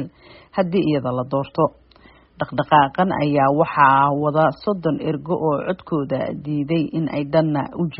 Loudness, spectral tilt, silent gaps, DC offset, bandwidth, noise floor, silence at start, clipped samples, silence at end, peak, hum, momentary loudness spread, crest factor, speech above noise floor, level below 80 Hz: -20 LUFS; -6 dB/octave; none; under 0.1%; 5.6 kHz; -50 dBFS; 0 s; under 0.1%; 0 s; 0 dBFS; none; 9 LU; 20 dB; 31 dB; -54 dBFS